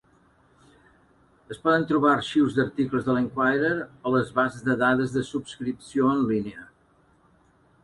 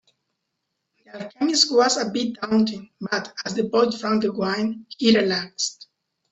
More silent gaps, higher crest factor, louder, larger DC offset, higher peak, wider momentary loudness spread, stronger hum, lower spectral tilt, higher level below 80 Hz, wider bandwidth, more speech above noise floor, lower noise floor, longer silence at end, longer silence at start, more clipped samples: neither; about the same, 18 dB vs 20 dB; about the same, -24 LUFS vs -22 LUFS; neither; second, -8 dBFS vs -2 dBFS; about the same, 11 LU vs 10 LU; neither; first, -6.5 dB/octave vs -3.5 dB/octave; first, -60 dBFS vs -66 dBFS; first, 11.5 kHz vs 8.4 kHz; second, 37 dB vs 56 dB; second, -61 dBFS vs -78 dBFS; first, 1.2 s vs 0.6 s; first, 1.5 s vs 1.15 s; neither